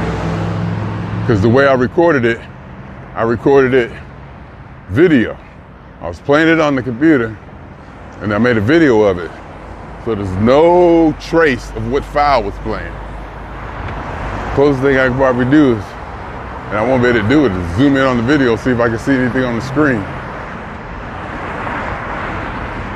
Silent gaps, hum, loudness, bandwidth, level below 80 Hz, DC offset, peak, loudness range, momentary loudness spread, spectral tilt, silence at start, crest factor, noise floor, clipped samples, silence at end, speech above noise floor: none; none; -14 LUFS; 10.5 kHz; -34 dBFS; under 0.1%; 0 dBFS; 4 LU; 19 LU; -7.5 dB/octave; 0 s; 14 dB; -36 dBFS; under 0.1%; 0 s; 24 dB